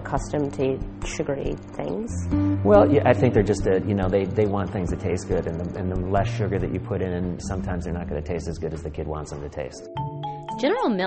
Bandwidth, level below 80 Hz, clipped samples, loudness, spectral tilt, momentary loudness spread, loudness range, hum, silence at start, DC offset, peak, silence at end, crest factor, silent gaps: 8.8 kHz; -38 dBFS; under 0.1%; -24 LUFS; -7 dB/octave; 13 LU; 9 LU; none; 0 s; under 0.1%; -2 dBFS; 0 s; 20 dB; none